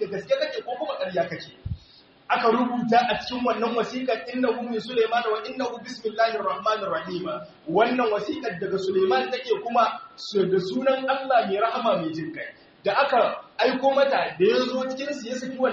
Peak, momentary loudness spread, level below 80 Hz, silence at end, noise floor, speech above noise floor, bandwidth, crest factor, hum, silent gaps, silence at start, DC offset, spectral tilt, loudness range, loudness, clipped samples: -6 dBFS; 10 LU; -56 dBFS; 0 s; -54 dBFS; 29 dB; 7.4 kHz; 18 dB; none; none; 0 s; under 0.1%; -3 dB/octave; 2 LU; -24 LUFS; under 0.1%